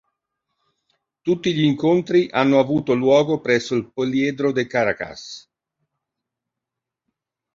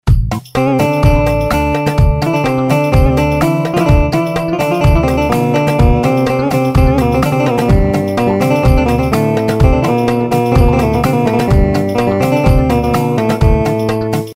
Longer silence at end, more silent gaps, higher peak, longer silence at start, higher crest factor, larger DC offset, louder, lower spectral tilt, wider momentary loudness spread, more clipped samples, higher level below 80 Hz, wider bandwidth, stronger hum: first, 2.15 s vs 0 s; neither; about the same, -2 dBFS vs 0 dBFS; first, 1.25 s vs 0.05 s; first, 20 dB vs 10 dB; neither; second, -19 LUFS vs -12 LUFS; second, -6 dB/octave vs -7.5 dB/octave; first, 12 LU vs 3 LU; neither; second, -60 dBFS vs -18 dBFS; second, 7.6 kHz vs 16.5 kHz; neither